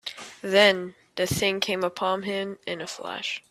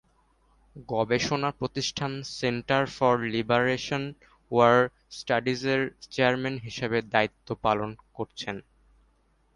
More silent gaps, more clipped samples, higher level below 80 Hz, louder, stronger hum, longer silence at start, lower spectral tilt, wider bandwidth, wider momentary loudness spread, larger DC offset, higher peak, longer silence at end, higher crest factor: neither; neither; about the same, -58 dBFS vs -58 dBFS; about the same, -25 LUFS vs -27 LUFS; neither; second, 0.05 s vs 0.75 s; second, -3.5 dB/octave vs -5 dB/octave; first, 15.5 kHz vs 11 kHz; first, 15 LU vs 12 LU; neither; about the same, -4 dBFS vs -6 dBFS; second, 0.1 s vs 0.95 s; about the same, 24 dB vs 22 dB